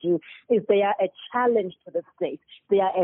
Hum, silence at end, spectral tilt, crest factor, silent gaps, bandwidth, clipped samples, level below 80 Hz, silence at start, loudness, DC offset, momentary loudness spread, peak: none; 0 s; -4.5 dB/octave; 16 dB; none; 3.9 kHz; under 0.1%; -72 dBFS; 0.05 s; -25 LUFS; under 0.1%; 11 LU; -8 dBFS